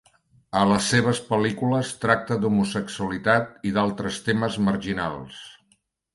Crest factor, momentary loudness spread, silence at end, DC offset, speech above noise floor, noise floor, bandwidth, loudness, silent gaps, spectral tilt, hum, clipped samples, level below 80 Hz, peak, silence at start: 20 dB; 8 LU; 0.6 s; under 0.1%; 43 dB; -67 dBFS; 11.5 kHz; -23 LUFS; none; -5 dB/octave; none; under 0.1%; -52 dBFS; -4 dBFS; 0.55 s